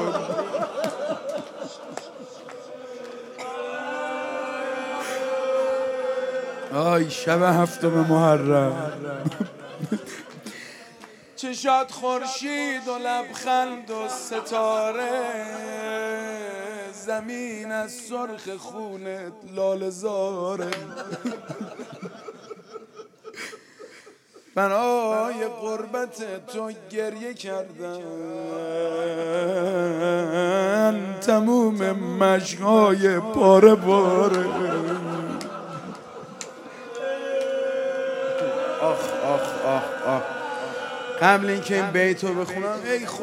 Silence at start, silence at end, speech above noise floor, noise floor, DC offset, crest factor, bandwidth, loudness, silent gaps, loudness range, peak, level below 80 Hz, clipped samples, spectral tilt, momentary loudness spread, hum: 0 s; 0 s; 28 dB; -51 dBFS; under 0.1%; 24 dB; 16 kHz; -24 LUFS; none; 13 LU; -2 dBFS; -72 dBFS; under 0.1%; -5.5 dB/octave; 18 LU; none